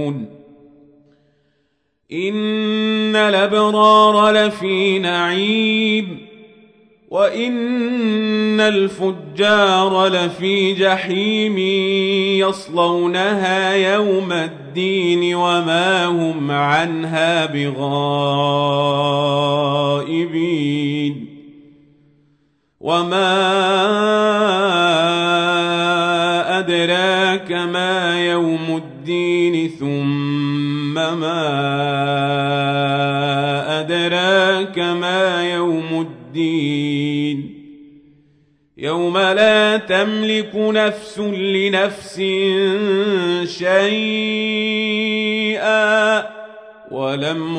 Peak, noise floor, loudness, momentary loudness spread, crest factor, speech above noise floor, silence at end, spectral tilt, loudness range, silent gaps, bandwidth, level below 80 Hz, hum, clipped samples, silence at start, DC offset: -2 dBFS; -67 dBFS; -17 LUFS; 7 LU; 16 dB; 50 dB; 0 s; -5 dB/octave; 5 LU; none; 10.5 kHz; -64 dBFS; none; under 0.1%; 0 s; under 0.1%